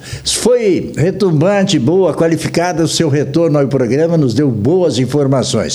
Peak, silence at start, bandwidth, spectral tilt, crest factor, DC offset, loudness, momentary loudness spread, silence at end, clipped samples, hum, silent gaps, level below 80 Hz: 0 dBFS; 0 s; 19.5 kHz; -5.5 dB/octave; 12 dB; under 0.1%; -13 LUFS; 3 LU; 0 s; under 0.1%; none; none; -44 dBFS